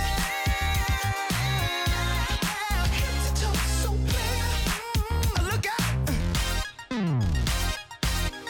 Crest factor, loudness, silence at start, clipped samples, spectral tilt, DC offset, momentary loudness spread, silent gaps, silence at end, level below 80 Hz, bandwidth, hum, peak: 16 dB; -27 LUFS; 0 s; under 0.1%; -4 dB/octave; under 0.1%; 3 LU; none; 0 s; -30 dBFS; 17.5 kHz; none; -10 dBFS